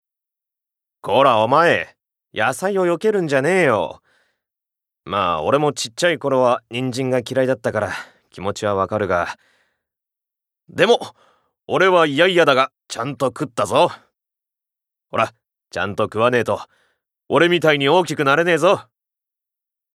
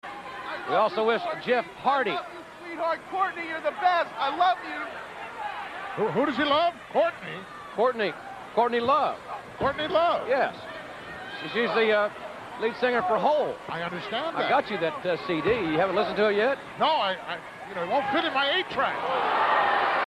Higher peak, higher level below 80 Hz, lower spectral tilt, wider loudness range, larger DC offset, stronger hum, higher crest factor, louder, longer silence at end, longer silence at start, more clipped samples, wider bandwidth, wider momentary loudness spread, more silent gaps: first, 0 dBFS vs -12 dBFS; about the same, -64 dBFS vs -62 dBFS; about the same, -4.5 dB/octave vs -5 dB/octave; first, 5 LU vs 2 LU; neither; neither; about the same, 20 dB vs 16 dB; first, -18 LUFS vs -26 LUFS; first, 1.15 s vs 0 s; first, 1.05 s vs 0.05 s; neither; about the same, 14 kHz vs 13.5 kHz; about the same, 13 LU vs 14 LU; neither